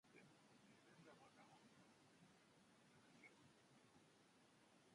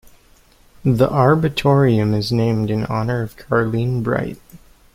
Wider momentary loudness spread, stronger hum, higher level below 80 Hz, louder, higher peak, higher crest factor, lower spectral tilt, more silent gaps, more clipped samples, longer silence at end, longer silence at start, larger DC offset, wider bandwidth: second, 1 LU vs 8 LU; neither; second, under -90 dBFS vs -44 dBFS; second, -69 LUFS vs -18 LUFS; second, -56 dBFS vs -2 dBFS; about the same, 16 dB vs 16 dB; second, -4 dB/octave vs -8 dB/octave; neither; neither; second, 0 s vs 0.4 s; second, 0.05 s vs 0.85 s; neither; second, 11 kHz vs 15.5 kHz